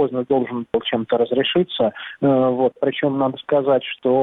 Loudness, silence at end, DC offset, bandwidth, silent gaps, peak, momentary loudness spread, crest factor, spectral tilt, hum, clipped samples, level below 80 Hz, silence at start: -20 LUFS; 0 s; under 0.1%; 4.1 kHz; none; -6 dBFS; 5 LU; 12 dB; -9 dB/octave; none; under 0.1%; -60 dBFS; 0 s